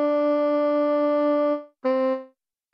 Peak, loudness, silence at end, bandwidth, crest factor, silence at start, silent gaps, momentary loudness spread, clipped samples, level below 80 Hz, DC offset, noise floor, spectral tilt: -14 dBFS; -23 LUFS; 0.45 s; 5.6 kHz; 8 dB; 0 s; none; 5 LU; under 0.1%; -82 dBFS; under 0.1%; -55 dBFS; -6 dB/octave